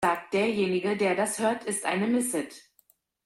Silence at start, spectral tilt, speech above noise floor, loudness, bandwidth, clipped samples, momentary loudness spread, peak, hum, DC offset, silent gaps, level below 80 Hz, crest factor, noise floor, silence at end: 0 s; -4 dB/octave; 39 dB; -27 LUFS; 16 kHz; under 0.1%; 4 LU; -12 dBFS; none; under 0.1%; none; -68 dBFS; 16 dB; -66 dBFS; 0.65 s